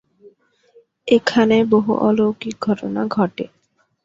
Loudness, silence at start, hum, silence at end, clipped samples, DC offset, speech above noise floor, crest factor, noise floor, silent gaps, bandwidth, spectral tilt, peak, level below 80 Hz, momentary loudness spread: -18 LUFS; 1.05 s; none; 0.6 s; under 0.1%; under 0.1%; 37 dB; 18 dB; -54 dBFS; none; 7.6 kHz; -6.5 dB/octave; -2 dBFS; -58 dBFS; 12 LU